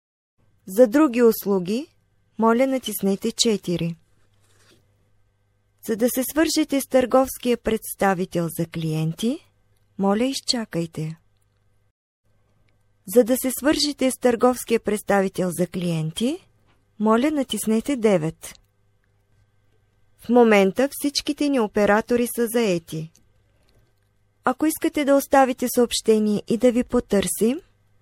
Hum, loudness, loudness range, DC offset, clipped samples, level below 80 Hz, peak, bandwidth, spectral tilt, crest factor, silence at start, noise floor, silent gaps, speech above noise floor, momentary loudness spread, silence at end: none; -21 LUFS; 6 LU; under 0.1%; under 0.1%; -54 dBFS; -2 dBFS; 16.5 kHz; -4.5 dB/octave; 20 dB; 0.65 s; -65 dBFS; 11.91-12.24 s; 45 dB; 11 LU; 0.4 s